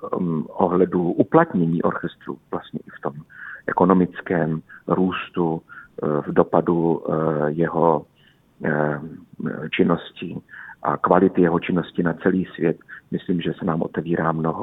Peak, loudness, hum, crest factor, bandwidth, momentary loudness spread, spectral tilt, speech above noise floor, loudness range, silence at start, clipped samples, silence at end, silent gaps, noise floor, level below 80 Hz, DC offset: 0 dBFS; -22 LUFS; none; 20 dB; 4 kHz; 14 LU; -10.5 dB/octave; 35 dB; 2 LU; 0 s; under 0.1%; 0 s; none; -57 dBFS; -56 dBFS; under 0.1%